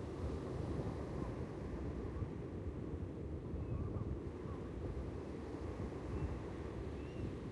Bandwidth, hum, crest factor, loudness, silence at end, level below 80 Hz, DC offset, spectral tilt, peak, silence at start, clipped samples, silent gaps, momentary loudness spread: 11 kHz; none; 14 dB; -45 LUFS; 0 s; -50 dBFS; under 0.1%; -8.5 dB/octave; -28 dBFS; 0 s; under 0.1%; none; 3 LU